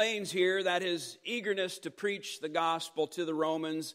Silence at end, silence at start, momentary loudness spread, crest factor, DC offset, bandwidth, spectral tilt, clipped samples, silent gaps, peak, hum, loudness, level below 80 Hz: 0 s; 0 s; 7 LU; 18 dB; under 0.1%; 16 kHz; -3.5 dB/octave; under 0.1%; none; -14 dBFS; none; -33 LUFS; -90 dBFS